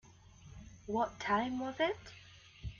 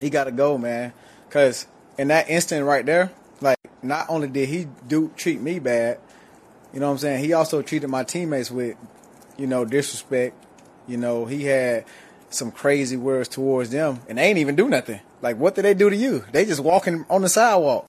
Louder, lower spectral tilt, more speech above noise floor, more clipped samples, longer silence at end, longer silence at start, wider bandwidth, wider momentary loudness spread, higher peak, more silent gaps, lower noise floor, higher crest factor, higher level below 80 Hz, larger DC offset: second, -36 LUFS vs -22 LUFS; about the same, -5 dB/octave vs -4.5 dB/octave; second, 23 dB vs 28 dB; neither; about the same, 0 s vs 0.05 s; first, 0.4 s vs 0 s; second, 7.4 kHz vs 14.5 kHz; first, 21 LU vs 10 LU; second, -20 dBFS vs -4 dBFS; neither; first, -58 dBFS vs -50 dBFS; about the same, 20 dB vs 18 dB; first, -58 dBFS vs -68 dBFS; neither